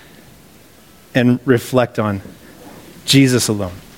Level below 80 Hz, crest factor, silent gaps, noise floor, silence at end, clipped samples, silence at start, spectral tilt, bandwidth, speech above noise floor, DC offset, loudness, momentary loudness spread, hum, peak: -50 dBFS; 18 dB; none; -45 dBFS; 0.2 s; under 0.1%; 1.15 s; -5 dB/octave; 17 kHz; 30 dB; under 0.1%; -16 LUFS; 11 LU; none; 0 dBFS